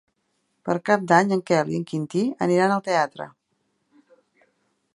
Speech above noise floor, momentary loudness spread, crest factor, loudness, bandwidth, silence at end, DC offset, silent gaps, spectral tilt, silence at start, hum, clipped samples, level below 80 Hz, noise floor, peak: 51 dB; 11 LU; 22 dB; -22 LUFS; 11.5 kHz; 1.65 s; under 0.1%; none; -6 dB/octave; 0.65 s; none; under 0.1%; -70 dBFS; -72 dBFS; -2 dBFS